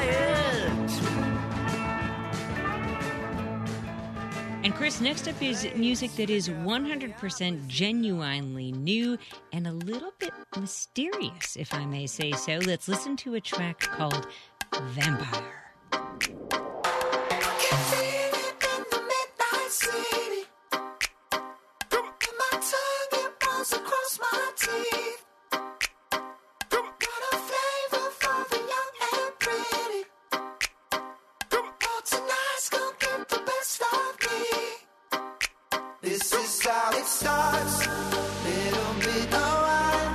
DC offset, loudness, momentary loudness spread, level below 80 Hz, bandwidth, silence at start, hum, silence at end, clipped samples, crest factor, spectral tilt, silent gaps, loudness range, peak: under 0.1%; -29 LUFS; 9 LU; -52 dBFS; 13.5 kHz; 0 s; none; 0 s; under 0.1%; 22 dB; -3 dB/octave; none; 5 LU; -8 dBFS